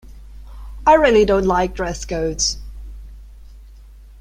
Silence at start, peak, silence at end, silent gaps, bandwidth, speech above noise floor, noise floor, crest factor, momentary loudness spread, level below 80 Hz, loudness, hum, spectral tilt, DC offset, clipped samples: 0.05 s; -2 dBFS; 0.4 s; none; 14.5 kHz; 25 dB; -41 dBFS; 18 dB; 26 LU; -34 dBFS; -17 LUFS; none; -3.5 dB/octave; under 0.1%; under 0.1%